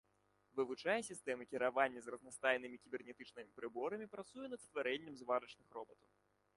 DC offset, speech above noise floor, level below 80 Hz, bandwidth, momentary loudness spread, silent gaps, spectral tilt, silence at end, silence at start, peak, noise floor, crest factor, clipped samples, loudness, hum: under 0.1%; 35 dB; -86 dBFS; 11.5 kHz; 15 LU; none; -3.5 dB/octave; 0.65 s; 0.55 s; -20 dBFS; -78 dBFS; 24 dB; under 0.1%; -43 LUFS; none